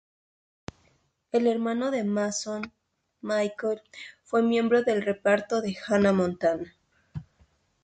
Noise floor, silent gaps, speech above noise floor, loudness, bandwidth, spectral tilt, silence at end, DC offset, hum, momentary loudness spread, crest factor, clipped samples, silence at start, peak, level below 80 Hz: -68 dBFS; none; 42 dB; -26 LUFS; 9.2 kHz; -5.5 dB/octave; 0.6 s; under 0.1%; none; 20 LU; 16 dB; under 0.1%; 1.35 s; -10 dBFS; -62 dBFS